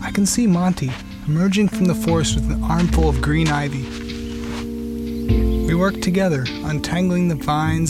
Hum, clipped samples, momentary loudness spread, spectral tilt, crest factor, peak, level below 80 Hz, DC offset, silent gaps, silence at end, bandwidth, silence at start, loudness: none; under 0.1%; 10 LU; -5.5 dB/octave; 14 dB; -6 dBFS; -28 dBFS; under 0.1%; none; 0 s; 15 kHz; 0 s; -20 LUFS